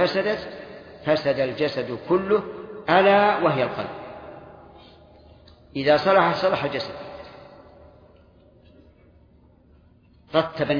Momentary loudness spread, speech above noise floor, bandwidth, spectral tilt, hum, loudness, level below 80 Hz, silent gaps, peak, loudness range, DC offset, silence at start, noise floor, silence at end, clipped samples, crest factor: 22 LU; 34 dB; 5.2 kHz; -7 dB/octave; none; -22 LUFS; -56 dBFS; none; -4 dBFS; 10 LU; under 0.1%; 0 s; -55 dBFS; 0 s; under 0.1%; 20 dB